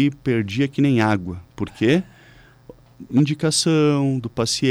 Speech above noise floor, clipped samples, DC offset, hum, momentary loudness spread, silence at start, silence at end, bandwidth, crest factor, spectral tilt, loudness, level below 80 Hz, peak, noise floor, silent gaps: 29 dB; under 0.1%; under 0.1%; none; 10 LU; 0 s; 0 s; 13.5 kHz; 12 dB; -5 dB/octave; -20 LUFS; -52 dBFS; -8 dBFS; -49 dBFS; none